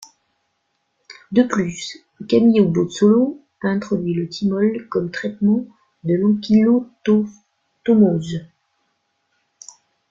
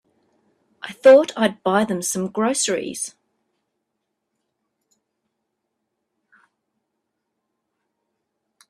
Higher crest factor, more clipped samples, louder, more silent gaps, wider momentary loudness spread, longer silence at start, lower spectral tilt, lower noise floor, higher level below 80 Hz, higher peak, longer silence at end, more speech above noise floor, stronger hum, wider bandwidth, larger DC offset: second, 18 dB vs 24 dB; neither; about the same, -18 LUFS vs -19 LUFS; neither; second, 14 LU vs 17 LU; first, 1.3 s vs 0.85 s; first, -7 dB/octave vs -3.5 dB/octave; second, -71 dBFS vs -78 dBFS; first, -58 dBFS vs -70 dBFS; about the same, -2 dBFS vs 0 dBFS; second, 1.65 s vs 5.6 s; second, 53 dB vs 60 dB; neither; second, 7.6 kHz vs 14 kHz; neither